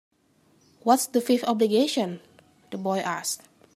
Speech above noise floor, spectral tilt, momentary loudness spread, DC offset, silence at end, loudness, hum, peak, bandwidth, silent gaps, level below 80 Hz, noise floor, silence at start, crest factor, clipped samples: 39 dB; -4 dB/octave; 12 LU; under 0.1%; 0.4 s; -25 LUFS; none; -6 dBFS; 15.5 kHz; none; -78 dBFS; -63 dBFS; 0.85 s; 20 dB; under 0.1%